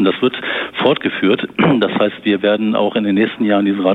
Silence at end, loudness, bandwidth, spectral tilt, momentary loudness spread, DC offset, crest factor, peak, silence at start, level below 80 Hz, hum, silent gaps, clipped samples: 0 s; -16 LUFS; 4.4 kHz; -8 dB/octave; 3 LU; under 0.1%; 14 dB; -2 dBFS; 0 s; -58 dBFS; none; none; under 0.1%